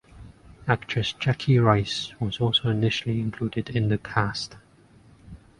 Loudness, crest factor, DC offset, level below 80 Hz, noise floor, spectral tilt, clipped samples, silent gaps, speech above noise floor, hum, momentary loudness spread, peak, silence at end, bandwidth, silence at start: -25 LUFS; 22 dB; under 0.1%; -50 dBFS; -55 dBFS; -6 dB/octave; under 0.1%; none; 30 dB; none; 9 LU; -4 dBFS; 0.25 s; 10.5 kHz; 0.15 s